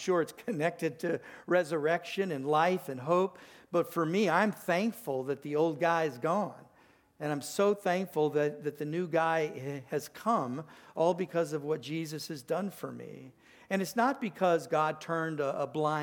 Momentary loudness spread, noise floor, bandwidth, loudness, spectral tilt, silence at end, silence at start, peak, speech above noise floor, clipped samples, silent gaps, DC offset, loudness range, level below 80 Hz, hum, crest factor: 10 LU; -64 dBFS; 19 kHz; -32 LUFS; -5.5 dB/octave; 0 s; 0 s; -12 dBFS; 32 dB; under 0.1%; none; under 0.1%; 4 LU; -80 dBFS; none; 20 dB